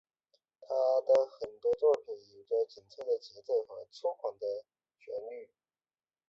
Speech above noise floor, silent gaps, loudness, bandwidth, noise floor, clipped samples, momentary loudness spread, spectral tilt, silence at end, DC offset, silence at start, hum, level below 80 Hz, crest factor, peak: over 57 dB; none; -33 LUFS; 7.4 kHz; under -90 dBFS; under 0.1%; 16 LU; -4 dB/octave; 0.85 s; under 0.1%; 0.6 s; none; -80 dBFS; 18 dB; -16 dBFS